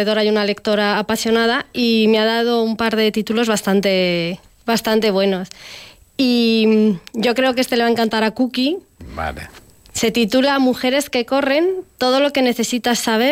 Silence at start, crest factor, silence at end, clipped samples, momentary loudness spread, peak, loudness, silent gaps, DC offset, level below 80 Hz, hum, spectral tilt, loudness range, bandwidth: 0 s; 12 dB; 0 s; under 0.1%; 12 LU; -6 dBFS; -17 LUFS; none; under 0.1%; -48 dBFS; none; -4 dB/octave; 2 LU; 16.5 kHz